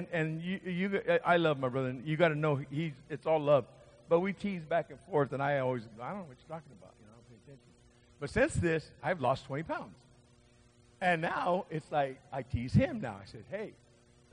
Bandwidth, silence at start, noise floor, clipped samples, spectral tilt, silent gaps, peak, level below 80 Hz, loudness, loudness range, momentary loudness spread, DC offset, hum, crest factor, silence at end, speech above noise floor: 10 kHz; 0 s; -63 dBFS; under 0.1%; -7 dB/octave; none; -14 dBFS; -58 dBFS; -33 LUFS; 6 LU; 14 LU; under 0.1%; none; 20 dB; 0.6 s; 30 dB